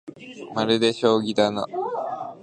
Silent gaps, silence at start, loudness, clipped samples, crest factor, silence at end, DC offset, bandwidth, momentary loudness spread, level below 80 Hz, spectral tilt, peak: none; 0.05 s; -23 LUFS; under 0.1%; 20 dB; 0 s; under 0.1%; 10 kHz; 12 LU; -68 dBFS; -5 dB/octave; -4 dBFS